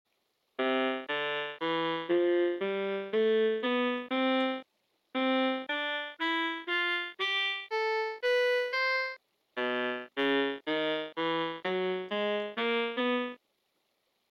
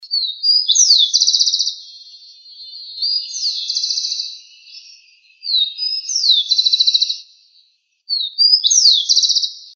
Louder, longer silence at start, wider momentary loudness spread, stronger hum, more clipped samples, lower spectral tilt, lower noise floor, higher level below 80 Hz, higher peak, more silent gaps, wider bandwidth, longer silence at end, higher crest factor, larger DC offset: second, -31 LUFS vs -13 LUFS; first, 0.6 s vs 0 s; second, 5 LU vs 13 LU; neither; neither; first, -5 dB/octave vs 14 dB/octave; first, -77 dBFS vs -58 dBFS; about the same, under -90 dBFS vs under -90 dBFS; second, -18 dBFS vs 0 dBFS; neither; first, 13.5 kHz vs 7.2 kHz; first, 1 s vs 0.05 s; about the same, 14 dB vs 18 dB; neither